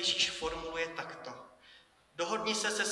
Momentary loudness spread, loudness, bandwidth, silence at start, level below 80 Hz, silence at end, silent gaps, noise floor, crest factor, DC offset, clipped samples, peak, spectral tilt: 20 LU; -34 LUFS; 12 kHz; 0 s; -62 dBFS; 0 s; none; -62 dBFS; 20 dB; under 0.1%; under 0.1%; -16 dBFS; -1 dB/octave